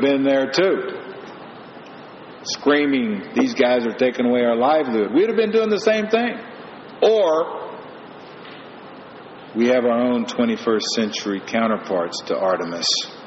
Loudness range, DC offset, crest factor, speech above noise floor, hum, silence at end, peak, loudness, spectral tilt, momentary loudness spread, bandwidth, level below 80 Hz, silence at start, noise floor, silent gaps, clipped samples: 4 LU; under 0.1%; 16 dB; 20 dB; none; 0 s; -4 dBFS; -19 LUFS; -2.5 dB/octave; 21 LU; 7.4 kHz; -66 dBFS; 0 s; -39 dBFS; none; under 0.1%